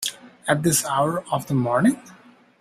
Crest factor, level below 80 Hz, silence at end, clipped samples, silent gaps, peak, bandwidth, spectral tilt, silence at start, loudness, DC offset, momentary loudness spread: 20 dB; -58 dBFS; 0.45 s; under 0.1%; none; -4 dBFS; 16 kHz; -4.5 dB/octave; 0 s; -22 LUFS; under 0.1%; 10 LU